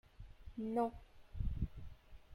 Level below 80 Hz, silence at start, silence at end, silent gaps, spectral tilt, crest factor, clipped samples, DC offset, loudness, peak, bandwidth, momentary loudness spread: -48 dBFS; 0.2 s; 0 s; none; -9.5 dB/octave; 20 dB; under 0.1%; under 0.1%; -43 LUFS; -24 dBFS; 16 kHz; 23 LU